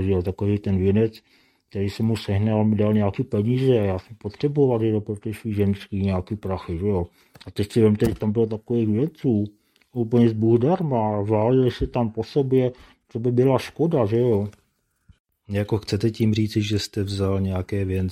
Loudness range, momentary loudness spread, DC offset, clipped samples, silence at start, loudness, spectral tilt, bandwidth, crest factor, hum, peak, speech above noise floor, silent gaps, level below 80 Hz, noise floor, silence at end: 3 LU; 9 LU; under 0.1%; under 0.1%; 0 s; -23 LUFS; -8 dB/octave; 13.5 kHz; 18 dB; none; -4 dBFS; 40 dB; 15.20-15.25 s; -48 dBFS; -61 dBFS; 0 s